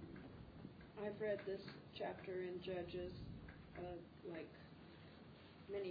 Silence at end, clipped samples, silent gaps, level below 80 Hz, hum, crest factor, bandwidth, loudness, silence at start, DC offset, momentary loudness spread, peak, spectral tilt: 0 s; under 0.1%; none; -68 dBFS; none; 18 dB; 5 kHz; -50 LUFS; 0 s; under 0.1%; 15 LU; -32 dBFS; -5 dB/octave